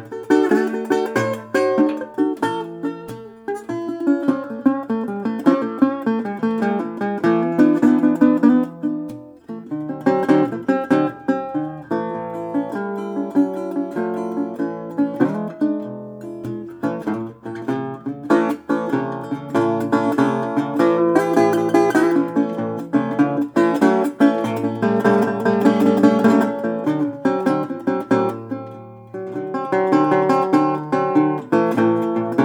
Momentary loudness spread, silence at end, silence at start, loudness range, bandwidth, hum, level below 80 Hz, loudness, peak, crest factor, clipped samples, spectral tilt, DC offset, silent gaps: 13 LU; 0 s; 0 s; 6 LU; 16.5 kHz; none; -66 dBFS; -19 LUFS; -2 dBFS; 18 dB; under 0.1%; -7.5 dB/octave; under 0.1%; none